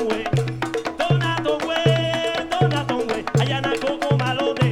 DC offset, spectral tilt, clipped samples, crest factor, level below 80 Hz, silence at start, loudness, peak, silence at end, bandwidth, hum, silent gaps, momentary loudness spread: under 0.1%; -6 dB/octave; under 0.1%; 16 dB; -50 dBFS; 0 s; -21 LUFS; -6 dBFS; 0 s; 12.5 kHz; none; none; 4 LU